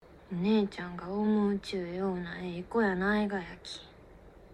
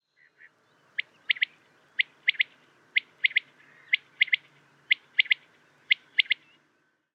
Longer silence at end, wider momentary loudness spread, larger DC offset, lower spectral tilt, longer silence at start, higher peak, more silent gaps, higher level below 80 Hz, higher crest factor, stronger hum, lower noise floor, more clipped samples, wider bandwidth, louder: second, 0 s vs 0.8 s; first, 13 LU vs 7 LU; neither; first, -7 dB/octave vs 0.5 dB/octave; second, 0.05 s vs 1 s; second, -16 dBFS vs -6 dBFS; neither; first, -58 dBFS vs under -90 dBFS; second, 16 dB vs 26 dB; neither; second, -54 dBFS vs -71 dBFS; neither; first, 10 kHz vs 7.2 kHz; second, -32 LUFS vs -27 LUFS